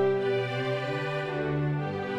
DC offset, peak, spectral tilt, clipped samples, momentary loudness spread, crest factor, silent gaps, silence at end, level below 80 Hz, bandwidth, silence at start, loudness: under 0.1%; -16 dBFS; -7.5 dB/octave; under 0.1%; 3 LU; 12 dB; none; 0 s; -58 dBFS; 9.4 kHz; 0 s; -29 LUFS